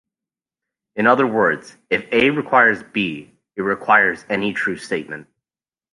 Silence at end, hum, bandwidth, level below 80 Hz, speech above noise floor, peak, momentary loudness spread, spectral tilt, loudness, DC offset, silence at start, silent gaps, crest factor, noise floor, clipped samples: 0.7 s; none; 11.5 kHz; -60 dBFS; over 72 dB; -2 dBFS; 16 LU; -5.5 dB/octave; -18 LUFS; under 0.1%; 0.95 s; none; 18 dB; under -90 dBFS; under 0.1%